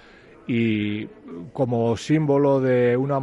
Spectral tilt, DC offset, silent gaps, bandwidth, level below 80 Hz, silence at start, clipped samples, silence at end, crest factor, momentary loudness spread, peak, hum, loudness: -7.5 dB/octave; under 0.1%; none; 11.5 kHz; -60 dBFS; 0.5 s; under 0.1%; 0 s; 14 dB; 17 LU; -8 dBFS; none; -22 LUFS